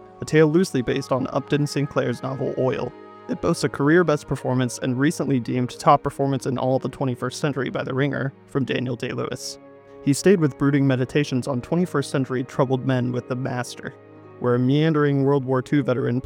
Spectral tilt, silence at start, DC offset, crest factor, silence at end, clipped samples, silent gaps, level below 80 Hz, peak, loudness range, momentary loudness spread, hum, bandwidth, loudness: -6.5 dB/octave; 0 s; under 0.1%; 18 dB; 0.05 s; under 0.1%; none; -54 dBFS; -4 dBFS; 3 LU; 9 LU; none; 16 kHz; -22 LUFS